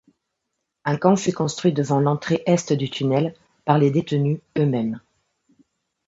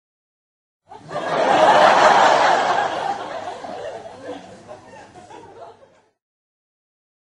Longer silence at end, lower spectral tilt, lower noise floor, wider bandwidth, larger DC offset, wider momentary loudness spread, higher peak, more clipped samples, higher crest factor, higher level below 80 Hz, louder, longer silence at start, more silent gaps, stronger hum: second, 1.1 s vs 1.65 s; first, -6.5 dB/octave vs -3 dB/octave; first, -79 dBFS vs -53 dBFS; second, 8 kHz vs 11.5 kHz; neither; second, 9 LU vs 23 LU; about the same, -2 dBFS vs 0 dBFS; neither; about the same, 20 dB vs 20 dB; about the same, -62 dBFS vs -64 dBFS; second, -21 LUFS vs -16 LUFS; about the same, 0.85 s vs 0.9 s; neither; neither